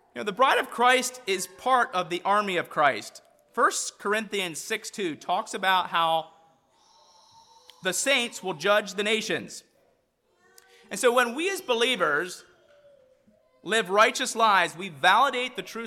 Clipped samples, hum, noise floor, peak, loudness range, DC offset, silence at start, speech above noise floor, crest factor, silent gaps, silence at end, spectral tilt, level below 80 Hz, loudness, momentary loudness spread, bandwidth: under 0.1%; none; -69 dBFS; -8 dBFS; 4 LU; under 0.1%; 0.15 s; 44 dB; 20 dB; none; 0 s; -2 dB/octave; -76 dBFS; -25 LUFS; 11 LU; 17.5 kHz